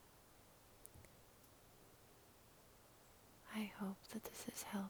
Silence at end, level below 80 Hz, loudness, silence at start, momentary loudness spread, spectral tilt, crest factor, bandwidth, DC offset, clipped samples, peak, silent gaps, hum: 0 s; -76 dBFS; -51 LUFS; 0 s; 18 LU; -4 dB/octave; 22 dB; over 20 kHz; under 0.1%; under 0.1%; -32 dBFS; none; none